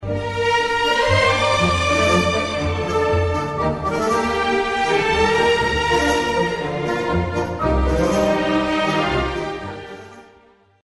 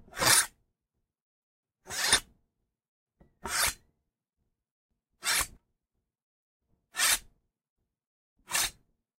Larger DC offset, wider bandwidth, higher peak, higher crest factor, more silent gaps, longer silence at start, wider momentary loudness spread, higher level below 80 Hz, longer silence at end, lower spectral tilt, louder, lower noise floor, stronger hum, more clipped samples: neither; second, 11.5 kHz vs 16 kHz; first, -4 dBFS vs -8 dBFS; second, 16 dB vs 26 dB; second, none vs 1.22-1.63 s, 2.88-3.06 s, 4.71-4.89 s, 6.22-6.60 s, 7.70-7.76 s, 8.07-8.36 s; second, 0 s vs 0.15 s; second, 7 LU vs 15 LU; first, -32 dBFS vs -58 dBFS; about the same, 0.6 s vs 0.5 s; first, -5 dB/octave vs 0.5 dB/octave; first, -19 LUFS vs -27 LUFS; second, -52 dBFS vs -85 dBFS; neither; neither